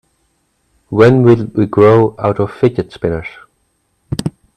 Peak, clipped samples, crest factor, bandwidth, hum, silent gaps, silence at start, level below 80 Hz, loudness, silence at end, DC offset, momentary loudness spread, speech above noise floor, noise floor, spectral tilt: 0 dBFS; 0.1%; 14 dB; 12.5 kHz; none; none; 0.9 s; -44 dBFS; -13 LUFS; 0.25 s; under 0.1%; 14 LU; 51 dB; -62 dBFS; -8.5 dB/octave